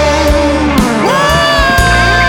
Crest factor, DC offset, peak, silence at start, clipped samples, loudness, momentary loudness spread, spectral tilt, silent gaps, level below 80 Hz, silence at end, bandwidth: 8 dB; under 0.1%; 0 dBFS; 0 s; under 0.1%; -9 LUFS; 3 LU; -4.5 dB/octave; none; -18 dBFS; 0 s; 19.5 kHz